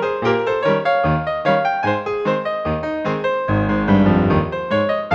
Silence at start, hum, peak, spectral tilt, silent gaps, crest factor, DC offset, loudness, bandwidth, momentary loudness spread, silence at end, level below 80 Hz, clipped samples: 0 s; none; -2 dBFS; -8 dB/octave; none; 16 dB; under 0.1%; -18 LUFS; 7.4 kHz; 6 LU; 0 s; -38 dBFS; under 0.1%